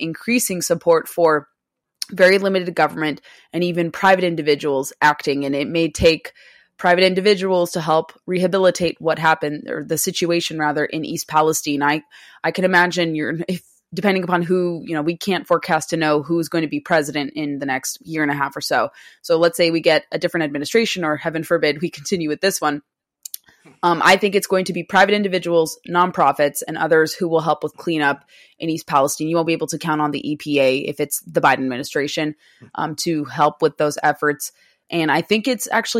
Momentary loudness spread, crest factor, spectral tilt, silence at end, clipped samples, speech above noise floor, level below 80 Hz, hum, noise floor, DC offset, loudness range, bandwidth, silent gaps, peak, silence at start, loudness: 9 LU; 18 dB; -4 dB/octave; 0 s; under 0.1%; 59 dB; -52 dBFS; none; -78 dBFS; under 0.1%; 3 LU; 16 kHz; none; -2 dBFS; 0 s; -19 LUFS